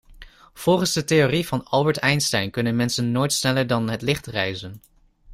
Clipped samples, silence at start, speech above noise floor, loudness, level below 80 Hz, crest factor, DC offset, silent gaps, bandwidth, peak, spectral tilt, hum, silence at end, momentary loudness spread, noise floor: under 0.1%; 0.1 s; 24 dB; -21 LUFS; -52 dBFS; 18 dB; under 0.1%; none; 16 kHz; -4 dBFS; -4.5 dB/octave; none; 0 s; 7 LU; -46 dBFS